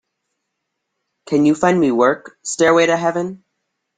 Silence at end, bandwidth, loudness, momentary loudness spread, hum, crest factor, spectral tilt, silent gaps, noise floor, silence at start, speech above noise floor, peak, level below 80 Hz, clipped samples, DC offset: 0.6 s; 9.6 kHz; -16 LUFS; 12 LU; none; 16 dB; -5 dB/octave; none; -76 dBFS; 1.3 s; 60 dB; -2 dBFS; -60 dBFS; under 0.1%; under 0.1%